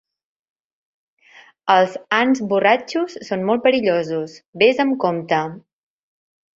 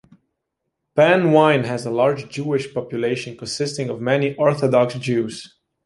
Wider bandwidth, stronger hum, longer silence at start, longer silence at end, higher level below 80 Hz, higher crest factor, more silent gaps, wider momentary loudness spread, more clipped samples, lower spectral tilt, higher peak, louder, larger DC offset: second, 7.8 kHz vs 11.5 kHz; neither; first, 1.65 s vs 0.95 s; first, 1 s vs 0.4 s; about the same, -66 dBFS vs -62 dBFS; about the same, 18 dB vs 18 dB; first, 4.48-4.53 s vs none; second, 9 LU vs 12 LU; neither; about the same, -5.5 dB/octave vs -6 dB/octave; about the same, -2 dBFS vs -2 dBFS; about the same, -18 LUFS vs -19 LUFS; neither